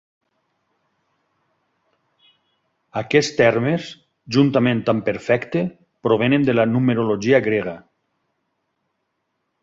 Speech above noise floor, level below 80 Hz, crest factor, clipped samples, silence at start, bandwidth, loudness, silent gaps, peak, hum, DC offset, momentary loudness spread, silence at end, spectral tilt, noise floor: 56 dB; -58 dBFS; 20 dB; under 0.1%; 2.95 s; 7.8 kHz; -19 LUFS; none; -2 dBFS; none; under 0.1%; 12 LU; 1.85 s; -6.5 dB/octave; -74 dBFS